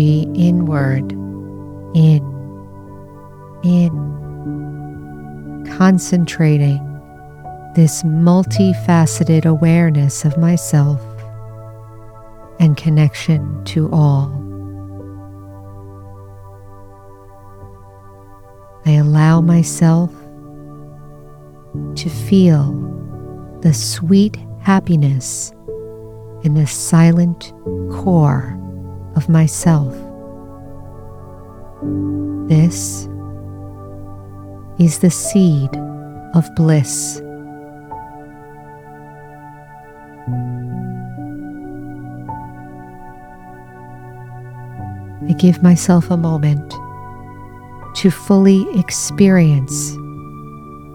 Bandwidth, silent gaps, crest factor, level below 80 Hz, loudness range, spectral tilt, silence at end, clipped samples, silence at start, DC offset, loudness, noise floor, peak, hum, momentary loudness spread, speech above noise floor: 14.5 kHz; none; 16 dB; -44 dBFS; 14 LU; -6.5 dB/octave; 0 s; under 0.1%; 0 s; under 0.1%; -15 LUFS; -39 dBFS; 0 dBFS; none; 24 LU; 26 dB